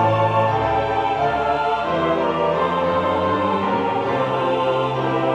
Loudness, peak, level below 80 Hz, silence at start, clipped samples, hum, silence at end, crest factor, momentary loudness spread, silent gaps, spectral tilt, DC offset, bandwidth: -20 LUFS; -6 dBFS; -46 dBFS; 0 s; under 0.1%; none; 0 s; 12 dB; 2 LU; none; -7 dB/octave; under 0.1%; 9.6 kHz